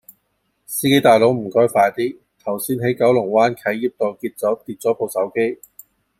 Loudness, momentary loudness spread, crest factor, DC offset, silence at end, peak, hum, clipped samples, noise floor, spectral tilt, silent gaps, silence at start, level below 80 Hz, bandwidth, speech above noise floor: -18 LUFS; 11 LU; 18 dB; under 0.1%; 0.65 s; -2 dBFS; none; under 0.1%; -69 dBFS; -5 dB/octave; none; 0.7 s; -62 dBFS; 16 kHz; 51 dB